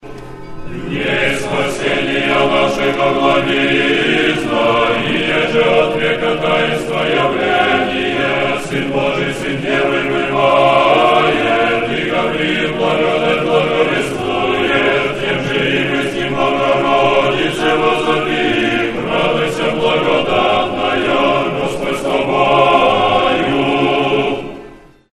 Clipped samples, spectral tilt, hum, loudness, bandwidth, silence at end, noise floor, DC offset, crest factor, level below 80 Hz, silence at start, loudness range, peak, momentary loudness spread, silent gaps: under 0.1%; -5 dB/octave; none; -14 LUFS; 13 kHz; 0.4 s; -38 dBFS; under 0.1%; 14 dB; -40 dBFS; 0.05 s; 2 LU; 0 dBFS; 6 LU; none